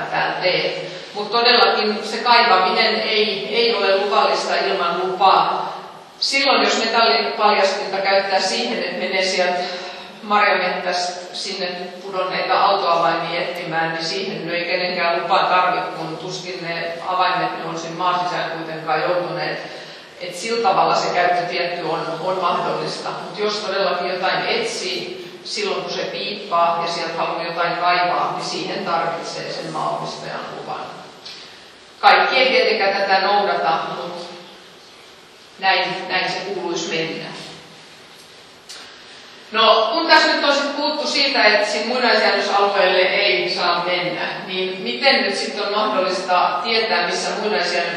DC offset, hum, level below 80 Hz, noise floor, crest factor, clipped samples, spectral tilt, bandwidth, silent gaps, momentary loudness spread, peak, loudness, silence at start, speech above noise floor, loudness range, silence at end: under 0.1%; none; -74 dBFS; -44 dBFS; 20 dB; under 0.1%; -3 dB/octave; 12.5 kHz; none; 14 LU; 0 dBFS; -18 LUFS; 0 s; 25 dB; 7 LU; 0 s